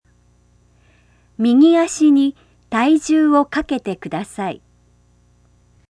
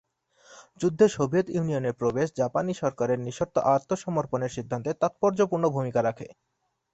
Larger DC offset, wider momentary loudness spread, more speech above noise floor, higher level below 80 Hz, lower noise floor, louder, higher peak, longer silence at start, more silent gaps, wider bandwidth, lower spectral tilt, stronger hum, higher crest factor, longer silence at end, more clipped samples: neither; first, 14 LU vs 8 LU; first, 40 dB vs 33 dB; first, -52 dBFS vs -62 dBFS; about the same, -55 dBFS vs -58 dBFS; first, -16 LUFS vs -26 LUFS; first, -2 dBFS vs -8 dBFS; first, 1.4 s vs 0.5 s; neither; first, 11 kHz vs 8.2 kHz; second, -5 dB/octave vs -6.5 dB/octave; first, 60 Hz at -45 dBFS vs none; about the same, 16 dB vs 20 dB; first, 1.35 s vs 0.6 s; neither